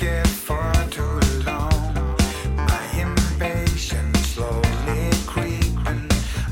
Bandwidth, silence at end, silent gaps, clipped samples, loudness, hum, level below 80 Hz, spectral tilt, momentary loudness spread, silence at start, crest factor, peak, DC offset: 17 kHz; 0 s; none; under 0.1%; -22 LUFS; none; -24 dBFS; -5 dB/octave; 3 LU; 0 s; 14 dB; -6 dBFS; under 0.1%